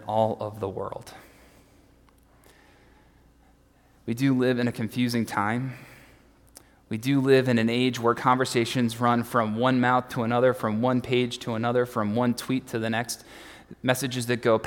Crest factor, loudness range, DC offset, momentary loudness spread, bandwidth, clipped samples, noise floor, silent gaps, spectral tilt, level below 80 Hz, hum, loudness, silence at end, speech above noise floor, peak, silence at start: 20 dB; 9 LU; under 0.1%; 13 LU; 18 kHz; under 0.1%; -59 dBFS; none; -5.5 dB/octave; -62 dBFS; none; -25 LUFS; 0 s; 34 dB; -6 dBFS; 0 s